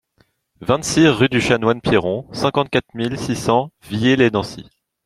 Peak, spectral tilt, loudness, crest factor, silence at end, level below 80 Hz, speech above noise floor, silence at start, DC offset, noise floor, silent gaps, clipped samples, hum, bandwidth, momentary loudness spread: 0 dBFS; -5 dB/octave; -18 LUFS; 18 dB; 0.45 s; -46 dBFS; 44 dB; 0.6 s; under 0.1%; -61 dBFS; none; under 0.1%; none; 14 kHz; 10 LU